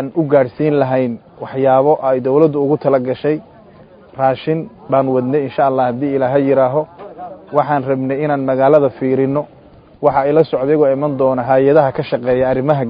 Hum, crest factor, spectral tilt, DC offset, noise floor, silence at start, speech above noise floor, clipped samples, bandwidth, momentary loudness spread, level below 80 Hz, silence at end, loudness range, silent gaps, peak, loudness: none; 14 dB; -11 dB/octave; under 0.1%; -42 dBFS; 0 s; 28 dB; under 0.1%; 5.2 kHz; 9 LU; -52 dBFS; 0 s; 2 LU; none; 0 dBFS; -15 LUFS